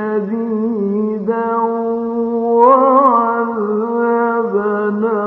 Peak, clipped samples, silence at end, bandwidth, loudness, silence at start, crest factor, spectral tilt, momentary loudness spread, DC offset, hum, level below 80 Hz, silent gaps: 0 dBFS; under 0.1%; 0 s; 3.7 kHz; -15 LUFS; 0 s; 14 dB; -10.5 dB/octave; 9 LU; under 0.1%; none; -62 dBFS; none